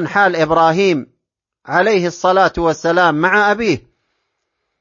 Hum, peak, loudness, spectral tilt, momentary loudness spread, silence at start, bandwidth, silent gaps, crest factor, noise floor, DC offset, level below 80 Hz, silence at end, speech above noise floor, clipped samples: none; 0 dBFS; -14 LUFS; -5 dB/octave; 6 LU; 0 s; 7.4 kHz; none; 16 dB; -77 dBFS; under 0.1%; -46 dBFS; 1 s; 63 dB; under 0.1%